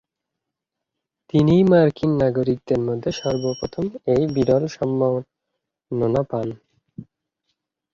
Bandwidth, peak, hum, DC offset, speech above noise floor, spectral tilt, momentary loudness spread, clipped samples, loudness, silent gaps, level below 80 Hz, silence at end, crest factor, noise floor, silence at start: 7.4 kHz; -4 dBFS; none; under 0.1%; 64 dB; -8 dB/octave; 11 LU; under 0.1%; -20 LUFS; none; -50 dBFS; 0.9 s; 18 dB; -83 dBFS; 1.35 s